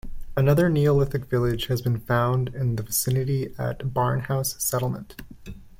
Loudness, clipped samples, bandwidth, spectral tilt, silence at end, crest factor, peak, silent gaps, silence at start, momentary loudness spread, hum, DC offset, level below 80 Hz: -24 LUFS; under 0.1%; 16.5 kHz; -5.5 dB/octave; 0.1 s; 16 dB; -8 dBFS; none; 0.05 s; 11 LU; none; under 0.1%; -42 dBFS